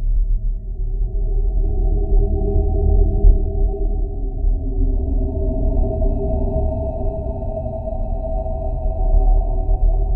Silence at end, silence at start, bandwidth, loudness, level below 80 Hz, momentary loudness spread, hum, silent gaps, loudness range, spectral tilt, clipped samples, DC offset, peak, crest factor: 0 s; 0 s; 1 kHz; -22 LUFS; -18 dBFS; 8 LU; none; none; 3 LU; -14 dB/octave; under 0.1%; under 0.1%; 0 dBFS; 16 dB